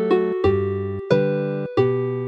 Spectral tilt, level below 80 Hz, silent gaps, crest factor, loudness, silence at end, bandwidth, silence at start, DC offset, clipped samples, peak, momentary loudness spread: -9 dB/octave; -48 dBFS; none; 18 dB; -21 LUFS; 0 s; 6.8 kHz; 0 s; under 0.1%; under 0.1%; -2 dBFS; 5 LU